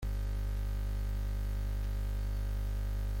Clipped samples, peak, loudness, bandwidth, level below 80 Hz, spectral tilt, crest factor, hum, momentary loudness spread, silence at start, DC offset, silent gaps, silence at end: under 0.1%; -28 dBFS; -38 LUFS; 16.5 kHz; -34 dBFS; -6.5 dB/octave; 6 dB; 50 Hz at -35 dBFS; 0 LU; 0 s; under 0.1%; none; 0 s